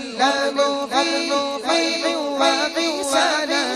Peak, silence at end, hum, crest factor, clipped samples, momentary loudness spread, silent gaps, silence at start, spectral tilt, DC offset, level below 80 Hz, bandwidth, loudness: -6 dBFS; 0 s; none; 14 dB; under 0.1%; 3 LU; none; 0 s; -1 dB/octave; under 0.1%; -64 dBFS; 14 kHz; -19 LUFS